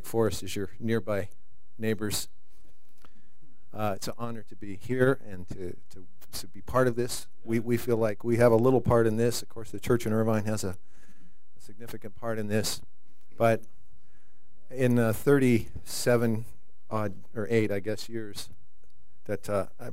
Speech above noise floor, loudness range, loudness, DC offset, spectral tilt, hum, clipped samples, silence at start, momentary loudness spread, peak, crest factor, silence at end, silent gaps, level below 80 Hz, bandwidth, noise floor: 36 dB; 8 LU; -28 LUFS; 3%; -6 dB/octave; none; under 0.1%; 0.05 s; 19 LU; -8 dBFS; 22 dB; 0 s; none; -56 dBFS; 16 kHz; -65 dBFS